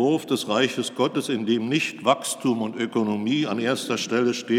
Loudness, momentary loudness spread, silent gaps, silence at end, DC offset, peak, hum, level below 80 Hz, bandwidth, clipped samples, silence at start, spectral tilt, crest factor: -24 LUFS; 3 LU; none; 0 s; under 0.1%; -6 dBFS; none; -82 dBFS; 16.5 kHz; under 0.1%; 0 s; -4.5 dB/octave; 18 dB